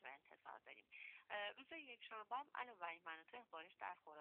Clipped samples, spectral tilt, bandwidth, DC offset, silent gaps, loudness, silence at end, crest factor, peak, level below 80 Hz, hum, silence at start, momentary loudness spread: under 0.1%; 2 dB/octave; 4.2 kHz; under 0.1%; none; -54 LUFS; 0 s; 20 dB; -34 dBFS; under -90 dBFS; none; 0 s; 11 LU